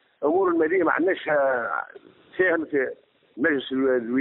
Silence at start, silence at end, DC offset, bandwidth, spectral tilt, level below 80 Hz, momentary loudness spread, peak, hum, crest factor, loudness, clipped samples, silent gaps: 0.2 s; 0 s; under 0.1%; 4 kHz; -3 dB/octave; -68 dBFS; 9 LU; -8 dBFS; none; 16 dB; -23 LUFS; under 0.1%; none